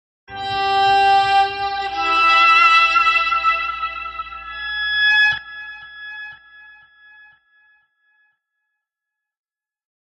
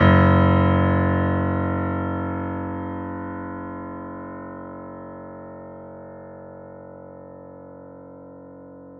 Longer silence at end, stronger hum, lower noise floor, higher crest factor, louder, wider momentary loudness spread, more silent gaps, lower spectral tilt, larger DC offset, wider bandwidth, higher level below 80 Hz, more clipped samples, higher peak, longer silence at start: first, 3.65 s vs 0 s; neither; first, -84 dBFS vs -42 dBFS; about the same, 16 dB vs 20 dB; first, -15 LUFS vs -22 LUFS; about the same, 22 LU vs 24 LU; neither; second, -1.5 dB/octave vs -10 dB/octave; neither; first, 8.8 kHz vs 4.3 kHz; second, -52 dBFS vs -46 dBFS; neither; about the same, -4 dBFS vs -4 dBFS; first, 0.3 s vs 0 s